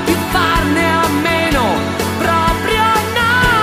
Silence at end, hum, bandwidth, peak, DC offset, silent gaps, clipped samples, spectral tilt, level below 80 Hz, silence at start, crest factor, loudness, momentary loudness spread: 0 s; none; 15.5 kHz; 0 dBFS; under 0.1%; none; under 0.1%; -4.5 dB/octave; -28 dBFS; 0 s; 14 dB; -14 LUFS; 3 LU